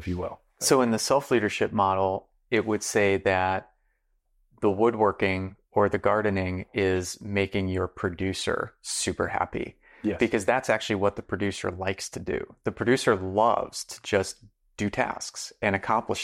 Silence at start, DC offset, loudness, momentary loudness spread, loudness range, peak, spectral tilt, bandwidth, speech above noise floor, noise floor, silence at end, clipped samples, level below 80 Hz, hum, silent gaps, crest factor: 0 s; under 0.1%; -26 LUFS; 10 LU; 3 LU; -10 dBFS; -4.5 dB/octave; 16 kHz; 45 dB; -71 dBFS; 0 s; under 0.1%; -58 dBFS; none; none; 18 dB